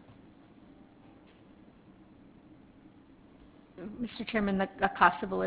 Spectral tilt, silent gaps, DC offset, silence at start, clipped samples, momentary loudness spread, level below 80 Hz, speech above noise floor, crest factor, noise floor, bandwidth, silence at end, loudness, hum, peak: -4 dB/octave; none; under 0.1%; 0.1 s; under 0.1%; 21 LU; -60 dBFS; 27 dB; 26 dB; -57 dBFS; 4 kHz; 0 s; -29 LUFS; none; -8 dBFS